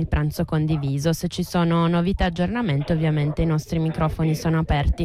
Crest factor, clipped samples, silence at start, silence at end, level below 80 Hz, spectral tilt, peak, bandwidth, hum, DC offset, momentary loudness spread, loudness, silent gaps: 10 dB; under 0.1%; 0 s; 0 s; -32 dBFS; -7 dB/octave; -10 dBFS; 15 kHz; none; under 0.1%; 3 LU; -22 LUFS; none